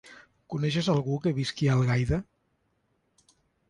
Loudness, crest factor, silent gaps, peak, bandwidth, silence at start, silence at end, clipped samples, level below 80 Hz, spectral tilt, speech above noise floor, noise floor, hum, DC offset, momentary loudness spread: -27 LUFS; 16 dB; none; -14 dBFS; 11 kHz; 0.05 s; 1.45 s; under 0.1%; -48 dBFS; -6.5 dB/octave; 47 dB; -73 dBFS; none; under 0.1%; 7 LU